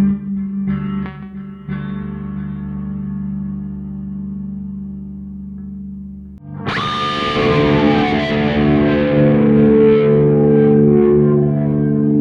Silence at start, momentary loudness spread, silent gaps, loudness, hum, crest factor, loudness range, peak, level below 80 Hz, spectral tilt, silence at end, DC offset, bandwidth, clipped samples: 0 s; 19 LU; none; -15 LUFS; none; 14 dB; 14 LU; -2 dBFS; -36 dBFS; -8.5 dB/octave; 0 s; under 0.1%; 7 kHz; under 0.1%